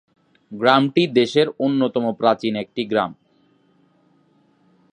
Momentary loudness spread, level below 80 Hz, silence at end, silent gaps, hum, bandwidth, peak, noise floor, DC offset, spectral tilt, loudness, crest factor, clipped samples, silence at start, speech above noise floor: 9 LU; -68 dBFS; 1.8 s; none; none; 9.8 kHz; 0 dBFS; -60 dBFS; under 0.1%; -6 dB/octave; -19 LUFS; 20 dB; under 0.1%; 0.5 s; 41 dB